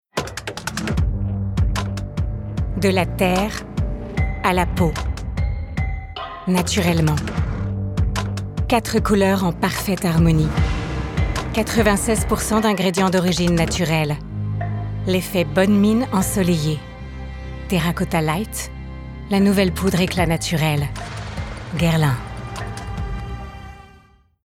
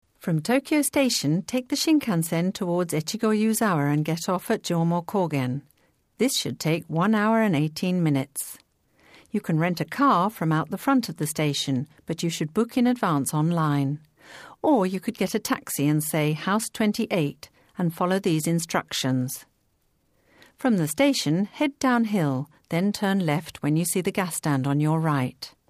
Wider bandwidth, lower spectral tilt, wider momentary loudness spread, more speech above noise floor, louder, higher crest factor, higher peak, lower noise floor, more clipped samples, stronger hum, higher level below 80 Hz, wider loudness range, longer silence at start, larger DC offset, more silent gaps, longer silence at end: about the same, 17 kHz vs 15.5 kHz; about the same, -5.5 dB/octave vs -5 dB/octave; first, 13 LU vs 7 LU; second, 34 dB vs 45 dB; first, -21 LUFS vs -24 LUFS; about the same, 16 dB vs 16 dB; first, -4 dBFS vs -8 dBFS; second, -52 dBFS vs -68 dBFS; neither; neither; first, -30 dBFS vs -64 dBFS; about the same, 4 LU vs 2 LU; about the same, 0.15 s vs 0.25 s; neither; neither; first, 0.55 s vs 0.2 s